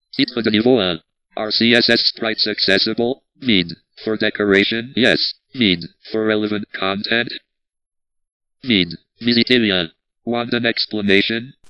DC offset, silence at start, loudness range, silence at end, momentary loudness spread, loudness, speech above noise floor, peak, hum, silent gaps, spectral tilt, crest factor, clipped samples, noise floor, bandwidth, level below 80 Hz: under 0.1%; 0.15 s; 5 LU; 0.2 s; 12 LU; -17 LUFS; 59 dB; 0 dBFS; none; 8.32-8.40 s; -5.5 dB/octave; 18 dB; under 0.1%; -77 dBFS; 10.5 kHz; -56 dBFS